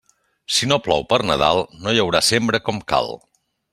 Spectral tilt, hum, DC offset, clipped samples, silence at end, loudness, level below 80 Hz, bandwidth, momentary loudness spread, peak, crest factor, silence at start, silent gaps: -3.5 dB/octave; none; under 0.1%; under 0.1%; 0.55 s; -18 LUFS; -48 dBFS; 15.5 kHz; 6 LU; -2 dBFS; 20 dB; 0.5 s; none